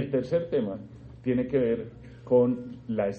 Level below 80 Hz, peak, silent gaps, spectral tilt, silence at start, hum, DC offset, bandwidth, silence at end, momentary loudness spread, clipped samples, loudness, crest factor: -56 dBFS; -12 dBFS; none; -9 dB/octave; 0 s; none; under 0.1%; 6.4 kHz; 0 s; 18 LU; under 0.1%; -28 LUFS; 16 dB